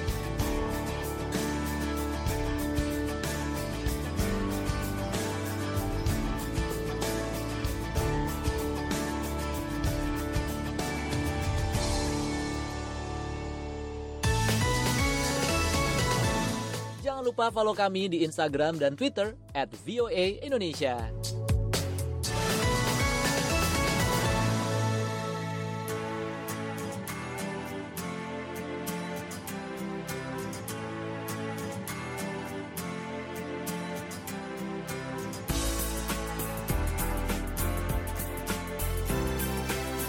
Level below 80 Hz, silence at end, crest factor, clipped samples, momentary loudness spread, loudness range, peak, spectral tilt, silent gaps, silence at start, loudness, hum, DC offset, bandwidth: -38 dBFS; 0 s; 16 dB; under 0.1%; 10 LU; 8 LU; -14 dBFS; -4.5 dB/octave; none; 0 s; -31 LUFS; none; under 0.1%; 17 kHz